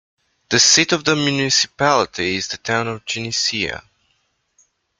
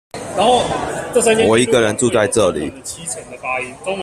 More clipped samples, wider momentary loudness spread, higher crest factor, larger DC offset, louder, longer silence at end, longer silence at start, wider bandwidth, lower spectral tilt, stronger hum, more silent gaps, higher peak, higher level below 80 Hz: neither; about the same, 12 LU vs 13 LU; about the same, 20 dB vs 16 dB; neither; about the same, -17 LUFS vs -16 LUFS; first, 1.2 s vs 0 s; first, 0.5 s vs 0.15 s; second, 12 kHz vs 14.5 kHz; second, -2 dB/octave vs -3.5 dB/octave; neither; neither; about the same, -2 dBFS vs 0 dBFS; second, -56 dBFS vs -46 dBFS